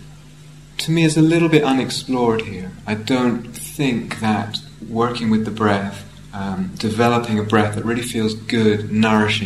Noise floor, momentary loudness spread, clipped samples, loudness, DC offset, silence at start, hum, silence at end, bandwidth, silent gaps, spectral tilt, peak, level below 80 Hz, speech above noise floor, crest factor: -41 dBFS; 13 LU; under 0.1%; -19 LUFS; 0.3%; 0 s; none; 0 s; 13.5 kHz; none; -5.5 dB/octave; 0 dBFS; -48 dBFS; 23 dB; 18 dB